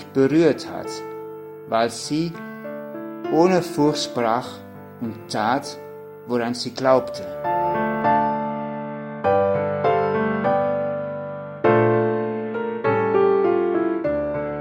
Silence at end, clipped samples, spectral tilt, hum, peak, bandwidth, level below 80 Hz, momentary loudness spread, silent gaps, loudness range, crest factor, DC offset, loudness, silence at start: 0 s; under 0.1%; -6 dB/octave; none; -2 dBFS; 16.5 kHz; -56 dBFS; 15 LU; none; 3 LU; 18 dB; under 0.1%; -22 LUFS; 0 s